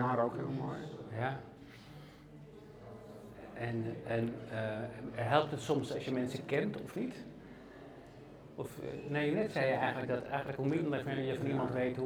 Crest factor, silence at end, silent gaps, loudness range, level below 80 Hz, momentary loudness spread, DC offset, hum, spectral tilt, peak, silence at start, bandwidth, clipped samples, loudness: 22 dB; 0 s; none; 7 LU; -66 dBFS; 20 LU; under 0.1%; none; -7 dB/octave; -14 dBFS; 0 s; 17 kHz; under 0.1%; -37 LUFS